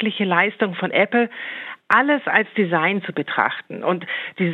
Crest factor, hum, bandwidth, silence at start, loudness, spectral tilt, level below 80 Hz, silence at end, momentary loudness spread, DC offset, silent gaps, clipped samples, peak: 20 dB; none; 6.4 kHz; 0 s; -20 LUFS; -7.5 dB/octave; -72 dBFS; 0 s; 8 LU; under 0.1%; none; under 0.1%; -2 dBFS